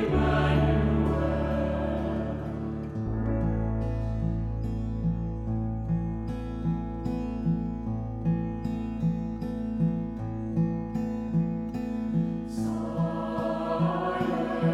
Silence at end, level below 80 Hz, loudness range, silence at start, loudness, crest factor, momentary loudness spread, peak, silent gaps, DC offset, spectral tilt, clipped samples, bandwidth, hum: 0 s; -36 dBFS; 3 LU; 0 s; -29 LUFS; 16 dB; 8 LU; -12 dBFS; none; under 0.1%; -9 dB/octave; under 0.1%; 9.8 kHz; none